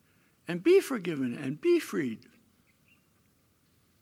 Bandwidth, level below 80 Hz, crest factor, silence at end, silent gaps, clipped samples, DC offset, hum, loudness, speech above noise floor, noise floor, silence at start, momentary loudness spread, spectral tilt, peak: 15.5 kHz; -80 dBFS; 18 dB; 1.85 s; none; under 0.1%; under 0.1%; none; -29 LUFS; 40 dB; -68 dBFS; 0.5 s; 14 LU; -6 dB/octave; -14 dBFS